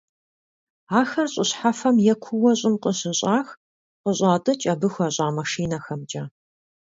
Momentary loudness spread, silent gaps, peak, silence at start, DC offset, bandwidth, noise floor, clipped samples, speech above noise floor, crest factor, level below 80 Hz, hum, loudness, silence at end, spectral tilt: 11 LU; 3.57-4.04 s; -4 dBFS; 0.9 s; under 0.1%; 7.8 kHz; under -90 dBFS; under 0.1%; over 68 dB; 18 dB; -62 dBFS; none; -22 LUFS; 0.65 s; -4.5 dB/octave